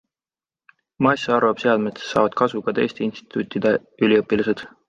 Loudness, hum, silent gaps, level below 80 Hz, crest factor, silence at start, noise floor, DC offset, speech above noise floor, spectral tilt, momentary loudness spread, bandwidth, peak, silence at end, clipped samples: -21 LUFS; none; none; -60 dBFS; 18 dB; 1 s; under -90 dBFS; under 0.1%; over 70 dB; -6 dB/octave; 7 LU; 7.8 kHz; -2 dBFS; 0.2 s; under 0.1%